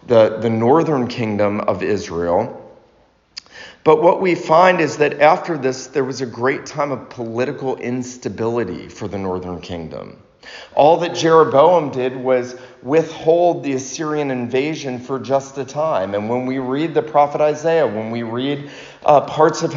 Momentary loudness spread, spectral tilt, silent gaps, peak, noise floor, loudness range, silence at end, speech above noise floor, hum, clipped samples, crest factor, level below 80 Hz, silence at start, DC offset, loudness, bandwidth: 15 LU; -5 dB/octave; none; 0 dBFS; -55 dBFS; 7 LU; 0 s; 38 dB; none; under 0.1%; 18 dB; -56 dBFS; 0.05 s; under 0.1%; -18 LUFS; 7.4 kHz